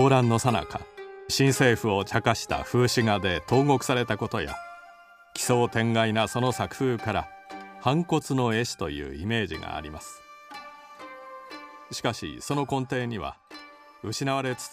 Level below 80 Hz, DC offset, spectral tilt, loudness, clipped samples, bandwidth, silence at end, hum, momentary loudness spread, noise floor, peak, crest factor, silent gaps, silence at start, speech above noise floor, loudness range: -52 dBFS; under 0.1%; -5 dB/octave; -26 LUFS; under 0.1%; 15.5 kHz; 0 s; none; 20 LU; -52 dBFS; -4 dBFS; 22 dB; none; 0 s; 26 dB; 10 LU